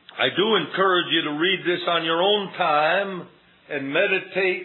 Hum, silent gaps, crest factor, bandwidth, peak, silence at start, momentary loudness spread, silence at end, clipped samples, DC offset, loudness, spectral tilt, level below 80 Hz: none; none; 16 dB; 4.3 kHz; -6 dBFS; 0.15 s; 6 LU; 0 s; under 0.1%; under 0.1%; -21 LUFS; -7.5 dB/octave; -84 dBFS